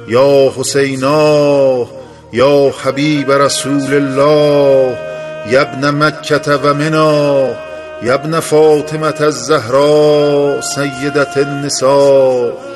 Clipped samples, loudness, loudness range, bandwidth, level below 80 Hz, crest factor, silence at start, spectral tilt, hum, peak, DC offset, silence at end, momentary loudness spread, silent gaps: under 0.1%; -11 LUFS; 1 LU; 12.5 kHz; -50 dBFS; 12 dB; 0 s; -5 dB/octave; none; 0 dBFS; under 0.1%; 0 s; 7 LU; none